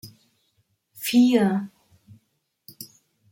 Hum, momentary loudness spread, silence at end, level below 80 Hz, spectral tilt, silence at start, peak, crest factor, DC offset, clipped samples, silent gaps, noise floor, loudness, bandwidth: none; 24 LU; 0.45 s; -72 dBFS; -5.5 dB/octave; 0.05 s; -8 dBFS; 18 dB; under 0.1%; under 0.1%; none; -73 dBFS; -21 LUFS; 16.5 kHz